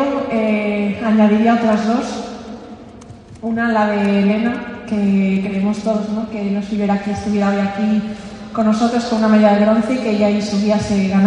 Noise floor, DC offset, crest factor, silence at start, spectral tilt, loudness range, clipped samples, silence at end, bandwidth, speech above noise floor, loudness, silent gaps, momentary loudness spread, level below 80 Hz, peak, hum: -37 dBFS; under 0.1%; 16 dB; 0 s; -7 dB/octave; 3 LU; under 0.1%; 0 s; 9.4 kHz; 22 dB; -16 LUFS; none; 13 LU; -46 dBFS; 0 dBFS; none